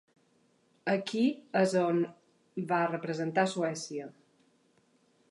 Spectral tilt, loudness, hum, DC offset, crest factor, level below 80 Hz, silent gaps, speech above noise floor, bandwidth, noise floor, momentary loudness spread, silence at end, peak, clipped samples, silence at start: -5.5 dB/octave; -31 LUFS; none; under 0.1%; 20 dB; -84 dBFS; none; 39 dB; 11.5 kHz; -69 dBFS; 12 LU; 1.2 s; -14 dBFS; under 0.1%; 0.85 s